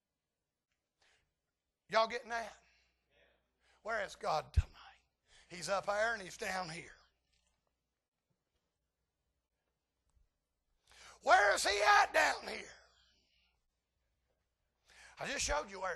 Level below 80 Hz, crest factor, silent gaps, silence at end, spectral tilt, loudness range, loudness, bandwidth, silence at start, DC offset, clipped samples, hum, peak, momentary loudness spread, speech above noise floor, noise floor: -54 dBFS; 24 dB; 8.08-8.12 s; 0 s; -2.5 dB/octave; 12 LU; -34 LUFS; 12.5 kHz; 1.9 s; under 0.1%; under 0.1%; none; -14 dBFS; 19 LU; over 56 dB; under -90 dBFS